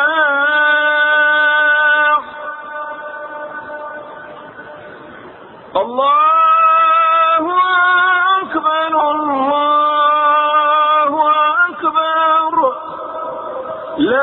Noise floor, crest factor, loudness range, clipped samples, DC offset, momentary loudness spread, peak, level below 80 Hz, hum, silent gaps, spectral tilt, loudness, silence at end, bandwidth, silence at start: -36 dBFS; 12 dB; 10 LU; under 0.1%; under 0.1%; 17 LU; -2 dBFS; -60 dBFS; none; none; -8 dB/octave; -12 LUFS; 0 s; 4.2 kHz; 0 s